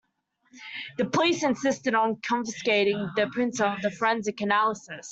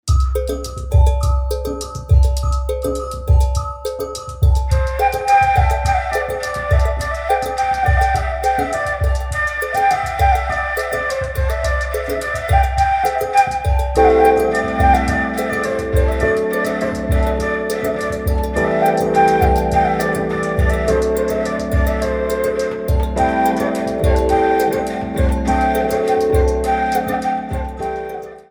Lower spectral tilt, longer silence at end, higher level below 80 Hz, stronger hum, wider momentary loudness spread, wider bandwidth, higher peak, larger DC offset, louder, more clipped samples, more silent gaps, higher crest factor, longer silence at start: second, -4 dB/octave vs -6 dB/octave; about the same, 0 s vs 0.1 s; second, -68 dBFS vs -22 dBFS; neither; about the same, 10 LU vs 8 LU; second, 8.2 kHz vs over 20 kHz; second, -8 dBFS vs 0 dBFS; neither; second, -26 LUFS vs -17 LUFS; neither; neither; about the same, 18 dB vs 16 dB; first, 0.55 s vs 0.05 s